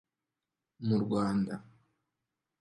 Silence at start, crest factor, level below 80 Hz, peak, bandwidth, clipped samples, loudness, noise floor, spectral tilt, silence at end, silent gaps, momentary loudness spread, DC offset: 0.8 s; 16 dB; -66 dBFS; -18 dBFS; 11.5 kHz; under 0.1%; -32 LUFS; -89 dBFS; -8 dB/octave; 1 s; none; 9 LU; under 0.1%